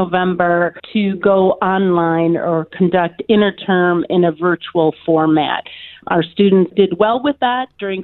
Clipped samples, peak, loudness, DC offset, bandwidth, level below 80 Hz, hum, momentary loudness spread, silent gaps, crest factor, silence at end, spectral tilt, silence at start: under 0.1%; 0 dBFS; -15 LUFS; under 0.1%; 4.3 kHz; -54 dBFS; none; 6 LU; none; 14 dB; 0 s; -10.5 dB/octave; 0 s